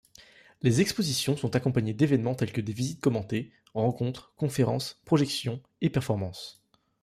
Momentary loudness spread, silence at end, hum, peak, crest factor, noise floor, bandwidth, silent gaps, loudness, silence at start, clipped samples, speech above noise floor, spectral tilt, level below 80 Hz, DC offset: 9 LU; 0.5 s; none; -10 dBFS; 18 dB; -55 dBFS; 15.5 kHz; none; -28 LUFS; 0.65 s; under 0.1%; 28 dB; -6 dB/octave; -60 dBFS; under 0.1%